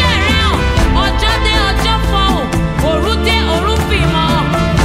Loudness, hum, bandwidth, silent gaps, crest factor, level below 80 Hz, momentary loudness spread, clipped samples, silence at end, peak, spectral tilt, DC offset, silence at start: -13 LUFS; none; 15.5 kHz; none; 12 dB; -18 dBFS; 2 LU; under 0.1%; 0 s; 0 dBFS; -5 dB/octave; under 0.1%; 0 s